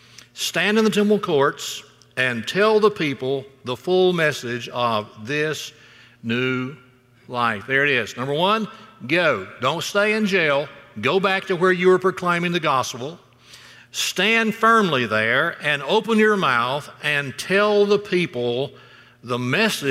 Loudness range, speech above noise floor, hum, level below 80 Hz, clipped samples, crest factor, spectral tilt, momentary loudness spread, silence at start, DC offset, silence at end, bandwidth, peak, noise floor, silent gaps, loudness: 4 LU; 26 dB; none; -66 dBFS; under 0.1%; 16 dB; -4.5 dB/octave; 12 LU; 0.35 s; under 0.1%; 0 s; 16 kHz; -6 dBFS; -46 dBFS; none; -20 LUFS